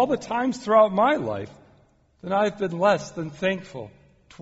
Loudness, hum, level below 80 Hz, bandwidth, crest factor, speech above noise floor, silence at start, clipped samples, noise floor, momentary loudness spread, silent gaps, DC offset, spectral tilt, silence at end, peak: -23 LUFS; none; -62 dBFS; 8 kHz; 18 dB; 36 dB; 0 s; under 0.1%; -59 dBFS; 21 LU; none; under 0.1%; -4.5 dB/octave; 0.5 s; -6 dBFS